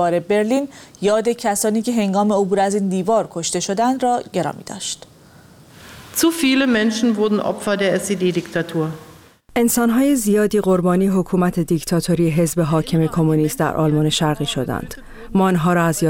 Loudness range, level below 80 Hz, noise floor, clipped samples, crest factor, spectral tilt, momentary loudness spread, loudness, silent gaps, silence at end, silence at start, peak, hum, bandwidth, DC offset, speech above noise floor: 3 LU; -46 dBFS; -46 dBFS; under 0.1%; 12 dB; -5 dB/octave; 8 LU; -18 LUFS; none; 0 s; 0 s; -6 dBFS; none; 17.5 kHz; under 0.1%; 28 dB